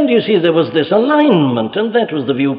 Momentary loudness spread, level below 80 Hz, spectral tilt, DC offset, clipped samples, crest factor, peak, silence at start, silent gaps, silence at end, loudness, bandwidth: 5 LU; -60 dBFS; -9.5 dB/octave; under 0.1%; under 0.1%; 12 dB; -2 dBFS; 0 s; none; 0 s; -13 LUFS; 5.2 kHz